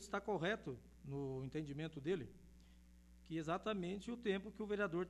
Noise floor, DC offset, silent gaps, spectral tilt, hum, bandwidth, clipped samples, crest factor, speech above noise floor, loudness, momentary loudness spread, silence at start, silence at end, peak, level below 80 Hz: -64 dBFS; under 0.1%; none; -6 dB/octave; none; 12.5 kHz; under 0.1%; 18 dB; 21 dB; -44 LUFS; 10 LU; 0 s; 0 s; -26 dBFS; -66 dBFS